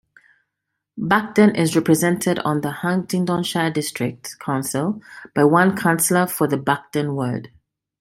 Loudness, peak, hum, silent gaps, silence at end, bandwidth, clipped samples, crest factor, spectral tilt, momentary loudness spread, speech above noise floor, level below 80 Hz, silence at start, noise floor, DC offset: -20 LUFS; -2 dBFS; none; none; 0.55 s; 16.5 kHz; under 0.1%; 18 dB; -5 dB/octave; 11 LU; 60 dB; -60 dBFS; 0.95 s; -79 dBFS; under 0.1%